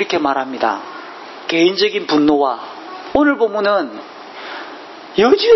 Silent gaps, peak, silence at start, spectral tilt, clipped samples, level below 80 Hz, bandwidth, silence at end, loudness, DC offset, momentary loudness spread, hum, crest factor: none; 0 dBFS; 0 s; -4.5 dB/octave; under 0.1%; -54 dBFS; 6.2 kHz; 0 s; -16 LUFS; under 0.1%; 18 LU; none; 16 dB